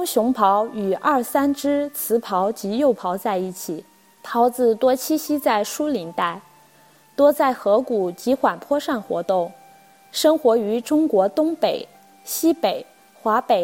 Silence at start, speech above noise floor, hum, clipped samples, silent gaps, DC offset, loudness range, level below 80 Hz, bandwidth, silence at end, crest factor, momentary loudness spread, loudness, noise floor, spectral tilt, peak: 0 s; 33 dB; none; under 0.1%; none; under 0.1%; 1 LU; -66 dBFS; 17 kHz; 0 s; 16 dB; 10 LU; -21 LUFS; -53 dBFS; -4.5 dB/octave; -4 dBFS